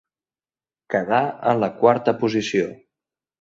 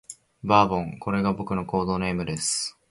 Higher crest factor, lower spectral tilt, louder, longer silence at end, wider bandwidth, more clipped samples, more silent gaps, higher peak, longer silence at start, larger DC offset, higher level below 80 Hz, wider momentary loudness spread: about the same, 20 dB vs 22 dB; first, -6 dB/octave vs -4.5 dB/octave; first, -21 LUFS vs -25 LUFS; first, 0.7 s vs 0.2 s; second, 7.8 kHz vs 11.5 kHz; neither; neither; about the same, -2 dBFS vs -4 dBFS; first, 0.9 s vs 0.1 s; neither; second, -62 dBFS vs -50 dBFS; about the same, 7 LU vs 9 LU